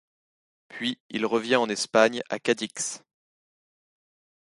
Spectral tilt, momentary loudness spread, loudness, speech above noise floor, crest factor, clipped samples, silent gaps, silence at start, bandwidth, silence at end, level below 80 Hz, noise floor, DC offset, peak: -2.5 dB/octave; 10 LU; -26 LUFS; over 64 dB; 24 dB; under 0.1%; 1.00-1.10 s; 0.7 s; 11.5 kHz; 1.45 s; -74 dBFS; under -90 dBFS; under 0.1%; -4 dBFS